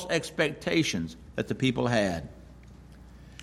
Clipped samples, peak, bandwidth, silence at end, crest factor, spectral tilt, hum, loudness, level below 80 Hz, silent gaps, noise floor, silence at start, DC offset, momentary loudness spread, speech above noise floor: under 0.1%; -10 dBFS; 14.5 kHz; 0 s; 20 dB; -5 dB/octave; none; -28 LUFS; -52 dBFS; none; -49 dBFS; 0 s; under 0.1%; 11 LU; 21 dB